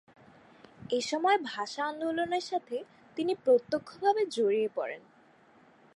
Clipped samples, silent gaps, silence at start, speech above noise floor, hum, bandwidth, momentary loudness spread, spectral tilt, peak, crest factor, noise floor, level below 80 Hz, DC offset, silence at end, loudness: under 0.1%; none; 0.8 s; 31 dB; none; 11.5 kHz; 13 LU; -3.5 dB/octave; -14 dBFS; 18 dB; -61 dBFS; -76 dBFS; under 0.1%; 0.95 s; -30 LUFS